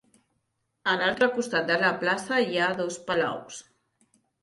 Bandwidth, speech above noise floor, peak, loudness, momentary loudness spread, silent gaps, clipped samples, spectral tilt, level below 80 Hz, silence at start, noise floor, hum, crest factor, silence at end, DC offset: 11.5 kHz; 51 dB; -10 dBFS; -26 LUFS; 9 LU; none; under 0.1%; -3.5 dB/octave; -70 dBFS; 0.85 s; -77 dBFS; none; 18 dB; 0.8 s; under 0.1%